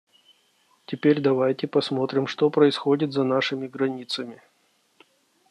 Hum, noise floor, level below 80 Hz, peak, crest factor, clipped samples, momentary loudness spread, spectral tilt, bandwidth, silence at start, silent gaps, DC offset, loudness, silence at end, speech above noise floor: none; -66 dBFS; -74 dBFS; -6 dBFS; 20 dB; under 0.1%; 11 LU; -6.5 dB/octave; 10.5 kHz; 0.9 s; none; under 0.1%; -23 LUFS; 1.15 s; 43 dB